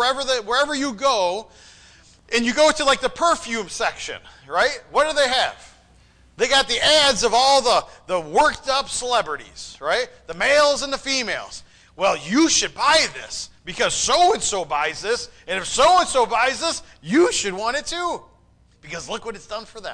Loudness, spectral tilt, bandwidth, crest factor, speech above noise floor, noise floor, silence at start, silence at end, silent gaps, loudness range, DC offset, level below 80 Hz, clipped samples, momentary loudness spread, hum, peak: -19 LUFS; -1.5 dB/octave; 10.5 kHz; 14 dB; 35 dB; -55 dBFS; 0 s; 0 s; none; 4 LU; under 0.1%; -48 dBFS; under 0.1%; 15 LU; none; -6 dBFS